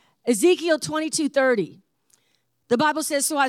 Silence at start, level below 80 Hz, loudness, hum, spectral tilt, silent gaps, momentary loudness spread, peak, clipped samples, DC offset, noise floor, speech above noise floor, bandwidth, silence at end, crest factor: 0.25 s; -74 dBFS; -22 LUFS; none; -3 dB/octave; none; 6 LU; -8 dBFS; under 0.1%; under 0.1%; -70 dBFS; 48 dB; 17 kHz; 0 s; 14 dB